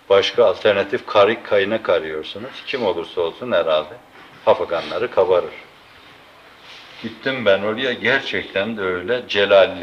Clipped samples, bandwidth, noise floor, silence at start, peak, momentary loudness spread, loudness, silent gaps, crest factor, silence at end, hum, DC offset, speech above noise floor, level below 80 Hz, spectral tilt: under 0.1%; 7.4 kHz; -46 dBFS; 0.1 s; -2 dBFS; 14 LU; -19 LUFS; none; 16 dB; 0 s; none; under 0.1%; 27 dB; -62 dBFS; -5 dB/octave